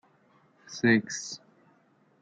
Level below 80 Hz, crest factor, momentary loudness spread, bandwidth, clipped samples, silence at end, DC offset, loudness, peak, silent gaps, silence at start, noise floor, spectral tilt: -74 dBFS; 22 dB; 19 LU; 9 kHz; under 0.1%; 0.85 s; under 0.1%; -27 LUFS; -8 dBFS; none; 0.7 s; -65 dBFS; -4.5 dB/octave